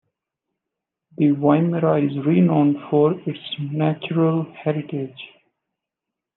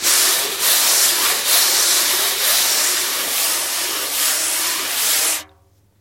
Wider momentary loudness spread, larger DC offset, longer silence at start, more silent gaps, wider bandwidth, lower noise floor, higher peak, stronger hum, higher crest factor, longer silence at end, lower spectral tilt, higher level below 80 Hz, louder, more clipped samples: first, 12 LU vs 6 LU; neither; first, 1.2 s vs 0 s; neither; second, 4.1 kHz vs 17 kHz; first, -85 dBFS vs -54 dBFS; about the same, -2 dBFS vs 0 dBFS; neither; about the same, 18 dB vs 18 dB; first, 1.1 s vs 0.55 s; first, -11.5 dB/octave vs 2.5 dB/octave; second, -72 dBFS vs -62 dBFS; second, -20 LUFS vs -15 LUFS; neither